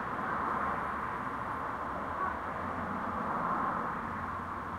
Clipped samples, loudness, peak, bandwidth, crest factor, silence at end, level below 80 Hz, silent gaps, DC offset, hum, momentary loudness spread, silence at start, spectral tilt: under 0.1%; -35 LUFS; -20 dBFS; 16 kHz; 14 dB; 0 s; -56 dBFS; none; under 0.1%; none; 4 LU; 0 s; -7 dB/octave